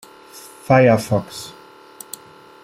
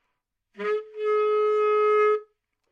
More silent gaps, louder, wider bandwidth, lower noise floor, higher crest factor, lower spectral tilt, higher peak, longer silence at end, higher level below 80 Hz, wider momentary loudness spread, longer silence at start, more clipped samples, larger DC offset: neither; first, -16 LUFS vs -24 LUFS; first, 16 kHz vs 5.4 kHz; second, -42 dBFS vs -79 dBFS; first, 18 dB vs 12 dB; first, -6 dB/octave vs -4.5 dB/octave; first, -2 dBFS vs -14 dBFS; first, 1.15 s vs 0.5 s; first, -56 dBFS vs -84 dBFS; first, 26 LU vs 9 LU; second, 0.35 s vs 0.6 s; neither; neither